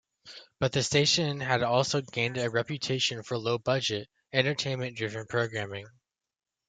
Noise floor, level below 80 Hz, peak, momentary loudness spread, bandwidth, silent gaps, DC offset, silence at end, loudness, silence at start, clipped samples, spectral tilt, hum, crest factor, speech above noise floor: under -90 dBFS; -66 dBFS; -10 dBFS; 11 LU; 9.4 kHz; none; under 0.1%; 0.8 s; -29 LUFS; 0.25 s; under 0.1%; -4 dB/octave; none; 22 dB; over 61 dB